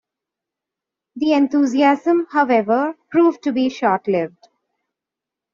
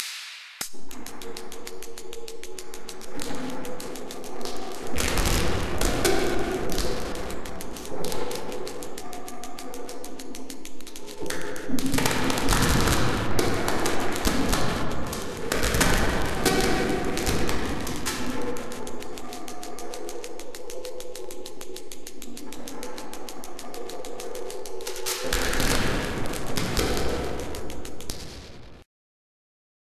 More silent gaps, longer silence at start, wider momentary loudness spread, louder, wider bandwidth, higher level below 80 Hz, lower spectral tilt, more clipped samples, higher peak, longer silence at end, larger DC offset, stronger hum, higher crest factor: neither; first, 1.15 s vs 0 s; second, 6 LU vs 15 LU; first, -18 LUFS vs -29 LUFS; second, 7.4 kHz vs 14 kHz; second, -66 dBFS vs -38 dBFS; about the same, -4 dB/octave vs -3.5 dB/octave; neither; about the same, -2 dBFS vs -4 dBFS; first, 1.25 s vs 1.05 s; neither; neither; second, 16 dB vs 22 dB